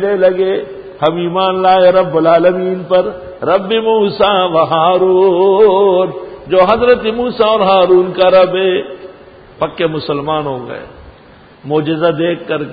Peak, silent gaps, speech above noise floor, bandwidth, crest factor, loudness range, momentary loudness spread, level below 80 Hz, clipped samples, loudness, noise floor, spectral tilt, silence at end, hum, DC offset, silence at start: 0 dBFS; none; 29 dB; 5 kHz; 12 dB; 7 LU; 12 LU; -46 dBFS; under 0.1%; -12 LUFS; -40 dBFS; -9 dB/octave; 0 s; none; under 0.1%; 0 s